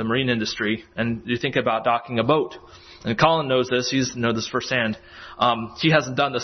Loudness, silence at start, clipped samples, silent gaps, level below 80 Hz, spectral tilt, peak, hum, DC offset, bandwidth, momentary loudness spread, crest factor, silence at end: -22 LUFS; 0 s; under 0.1%; none; -54 dBFS; -5 dB/octave; -4 dBFS; none; under 0.1%; 6.4 kHz; 8 LU; 18 dB; 0 s